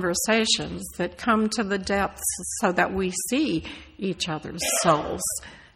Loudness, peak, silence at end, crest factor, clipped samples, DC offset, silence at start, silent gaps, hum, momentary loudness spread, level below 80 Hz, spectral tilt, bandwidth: -25 LUFS; -6 dBFS; 0.15 s; 20 dB; under 0.1%; under 0.1%; 0 s; none; none; 10 LU; -50 dBFS; -3 dB/octave; 16 kHz